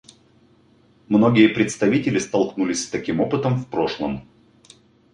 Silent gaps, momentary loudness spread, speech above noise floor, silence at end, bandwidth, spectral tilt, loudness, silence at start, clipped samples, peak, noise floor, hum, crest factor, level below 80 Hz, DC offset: none; 9 LU; 36 dB; 0.9 s; 11 kHz; -5.5 dB/octave; -20 LUFS; 1.1 s; under 0.1%; -2 dBFS; -56 dBFS; none; 20 dB; -54 dBFS; under 0.1%